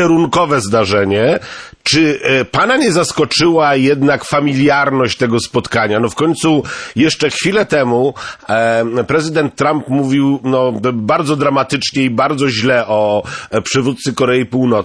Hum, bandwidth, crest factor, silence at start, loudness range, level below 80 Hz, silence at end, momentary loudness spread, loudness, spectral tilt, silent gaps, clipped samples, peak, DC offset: none; 11 kHz; 12 dB; 0 s; 2 LU; -48 dBFS; 0 s; 5 LU; -13 LUFS; -5 dB/octave; none; under 0.1%; -2 dBFS; under 0.1%